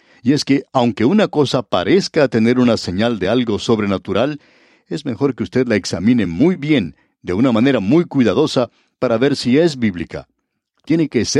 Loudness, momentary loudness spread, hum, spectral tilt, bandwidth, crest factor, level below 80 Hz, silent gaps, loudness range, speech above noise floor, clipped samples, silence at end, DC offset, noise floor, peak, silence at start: -16 LUFS; 9 LU; none; -6 dB/octave; 11 kHz; 14 dB; -50 dBFS; none; 3 LU; 54 dB; under 0.1%; 0 s; under 0.1%; -69 dBFS; -2 dBFS; 0.25 s